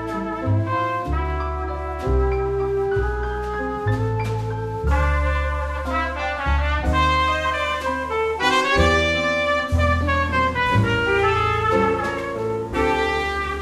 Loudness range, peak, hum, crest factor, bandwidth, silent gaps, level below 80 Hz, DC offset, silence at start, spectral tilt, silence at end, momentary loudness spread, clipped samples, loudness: 5 LU; -4 dBFS; none; 18 dB; 13 kHz; none; -28 dBFS; under 0.1%; 0 s; -6 dB/octave; 0 s; 7 LU; under 0.1%; -21 LUFS